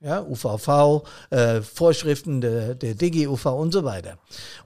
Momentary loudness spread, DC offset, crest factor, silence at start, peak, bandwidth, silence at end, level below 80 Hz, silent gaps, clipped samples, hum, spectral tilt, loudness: 11 LU; 0.4%; 16 dB; 0 s; -6 dBFS; 15.5 kHz; 0.05 s; -54 dBFS; none; under 0.1%; none; -6.5 dB/octave; -22 LUFS